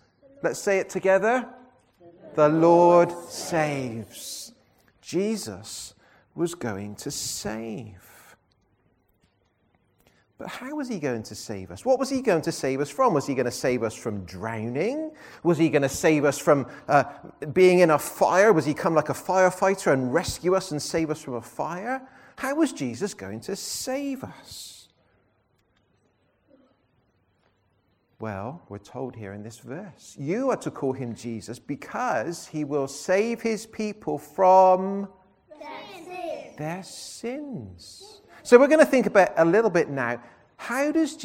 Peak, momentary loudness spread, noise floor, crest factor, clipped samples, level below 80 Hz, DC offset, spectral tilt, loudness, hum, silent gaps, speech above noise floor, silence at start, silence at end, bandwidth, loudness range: -2 dBFS; 20 LU; -68 dBFS; 24 dB; under 0.1%; -60 dBFS; under 0.1%; -5 dB/octave; -24 LUFS; none; none; 44 dB; 0.45 s; 0 s; 16.5 kHz; 15 LU